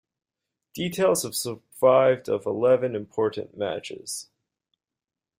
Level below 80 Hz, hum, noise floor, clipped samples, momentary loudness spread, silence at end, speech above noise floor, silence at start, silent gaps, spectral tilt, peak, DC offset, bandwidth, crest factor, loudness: -68 dBFS; none; -90 dBFS; under 0.1%; 14 LU; 1.15 s; 66 dB; 0.75 s; none; -4.5 dB/octave; -8 dBFS; under 0.1%; 16 kHz; 18 dB; -24 LUFS